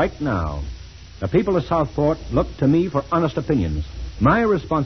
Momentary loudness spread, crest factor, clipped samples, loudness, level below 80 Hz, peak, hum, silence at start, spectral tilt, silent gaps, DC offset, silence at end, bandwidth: 13 LU; 16 dB; under 0.1%; -21 LUFS; -34 dBFS; -4 dBFS; none; 0 s; -8 dB/octave; none; 0.2%; 0 s; 6.4 kHz